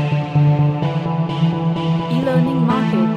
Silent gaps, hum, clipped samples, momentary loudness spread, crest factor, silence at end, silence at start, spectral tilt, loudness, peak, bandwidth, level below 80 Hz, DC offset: none; none; under 0.1%; 5 LU; 12 dB; 0 s; 0 s; -9 dB/octave; -17 LUFS; -4 dBFS; 6.6 kHz; -48 dBFS; under 0.1%